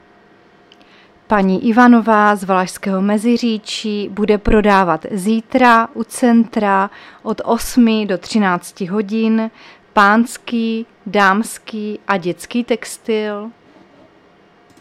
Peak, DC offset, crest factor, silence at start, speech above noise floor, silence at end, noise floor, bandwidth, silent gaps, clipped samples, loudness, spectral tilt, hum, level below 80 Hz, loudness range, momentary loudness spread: 0 dBFS; under 0.1%; 16 dB; 1.3 s; 34 dB; 1.3 s; -49 dBFS; 14.5 kHz; none; under 0.1%; -15 LUFS; -5.5 dB/octave; none; -38 dBFS; 5 LU; 12 LU